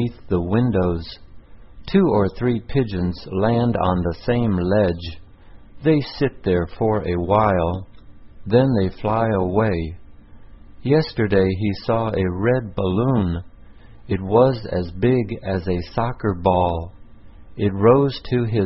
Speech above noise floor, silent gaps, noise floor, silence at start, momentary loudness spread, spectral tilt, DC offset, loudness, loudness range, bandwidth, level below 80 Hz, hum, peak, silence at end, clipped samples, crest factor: 24 dB; none; -44 dBFS; 0 s; 9 LU; -12 dB/octave; 0.5%; -20 LUFS; 1 LU; 5.8 kHz; -36 dBFS; none; -2 dBFS; 0 s; under 0.1%; 18 dB